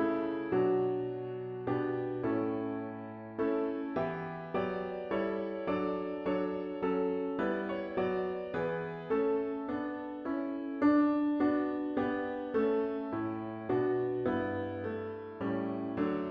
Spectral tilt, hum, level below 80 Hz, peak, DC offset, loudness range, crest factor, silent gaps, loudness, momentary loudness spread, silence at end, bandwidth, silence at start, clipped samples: -9.5 dB/octave; none; -66 dBFS; -16 dBFS; under 0.1%; 4 LU; 16 dB; none; -34 LUFS; 8 LU; 0 s; 5.2 kHz; 0 s; under 0.1%